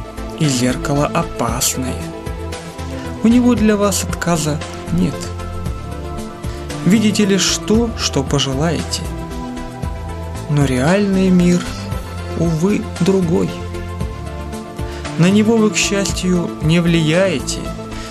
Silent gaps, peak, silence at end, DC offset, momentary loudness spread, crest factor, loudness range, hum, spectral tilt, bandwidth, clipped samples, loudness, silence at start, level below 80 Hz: none; 0 dBFS; 0 s; under 0.1%; 13 LU; 16 dB; 4 LU; none; -5 dB/octave; 15 kHz; under 0.1%; -17 LUFS; 0 s; -32 dBFS